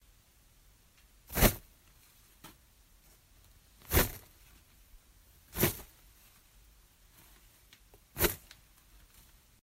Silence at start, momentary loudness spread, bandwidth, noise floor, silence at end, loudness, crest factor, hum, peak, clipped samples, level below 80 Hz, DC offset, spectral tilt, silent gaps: 1.3 s; 28 LU; 16 kHz; -64 dBFS; 1.25 s; -32 LUFS; 28 dB; none; -10 dBFS; under 0.1%; -46 dBFS; under 0.1%; -3.5 dB/octave; none